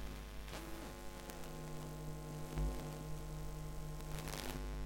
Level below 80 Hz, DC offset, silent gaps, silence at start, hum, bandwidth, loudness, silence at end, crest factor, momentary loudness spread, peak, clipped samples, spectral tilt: -48 dBFS; under 0.1%; none; 0 s; none; 17 kHz; -47 LUFS; 0 s; 22 dB; 7 LU; -24 dBFS; under 0.1%; -5 dB/octave